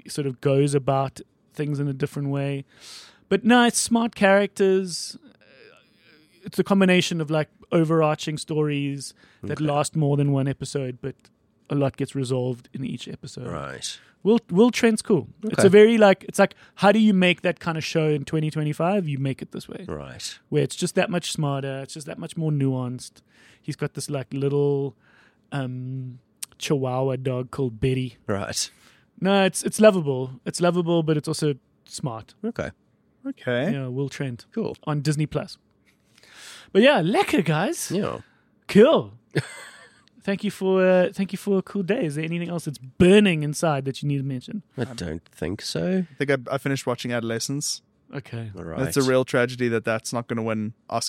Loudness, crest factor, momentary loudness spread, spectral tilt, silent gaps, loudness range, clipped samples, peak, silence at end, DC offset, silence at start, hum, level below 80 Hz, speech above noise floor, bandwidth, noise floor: -23 LUFS; 20 dB; 17 LU; -5.5 dB/octave; none; 9 LU; under 0.1%; -4 dBFS; 0 s; under 0.1%; 0.05 s; none; -56 dBFS; 39 dB; 16 kHz; -62 dBFS